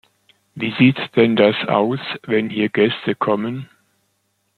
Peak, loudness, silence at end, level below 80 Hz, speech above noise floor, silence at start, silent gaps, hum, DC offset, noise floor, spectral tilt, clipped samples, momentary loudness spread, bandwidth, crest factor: -2 dBFS; -18 LUFS; 0.95 s; -62 dBFS; 50 dB; 0.55 s; none; none; under 0.1%; -68 dBFS; -8 dB/octave; under 0.1%; 11 LU; 4.6 kHz; 18 dB